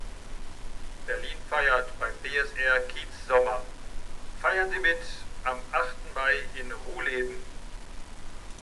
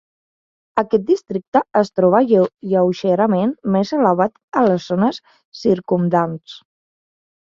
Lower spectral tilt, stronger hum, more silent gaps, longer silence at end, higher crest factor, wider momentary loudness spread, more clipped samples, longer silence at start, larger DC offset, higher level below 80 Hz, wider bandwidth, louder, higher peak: second, -3 dB/octave vs -8 dB/octave; neither; second, none vs 1.47-1.52 s, 4.43-4.48 s, 5.45-5.52 s; second, 0.05 s vs 0.9 s; about the same, 20 dB vs 16 dB; first, 21 LU vs 6 LU; neither; second, 0 s vs 0.75 s; neither; first, -40 dBFS vs -62 dBFS; first, 12 kHz vs 7.4 kHz; second, -28 LUFS vs -17 LUFS; second, -8 dBFS vs -2 dBFS